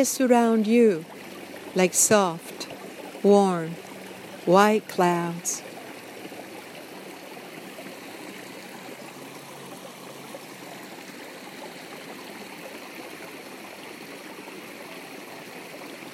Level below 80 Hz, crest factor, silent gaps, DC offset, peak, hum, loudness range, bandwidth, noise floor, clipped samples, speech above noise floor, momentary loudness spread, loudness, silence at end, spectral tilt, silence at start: -80 dBFS; 22 dB; none; under 0.1%; -4 dBFS; none; 17 LU; 16 kHz; -41 dBFS; under 0.1%; 20 dB; 21 LU; -22 LUFS; 0 s; -4 dB/octave; 0 s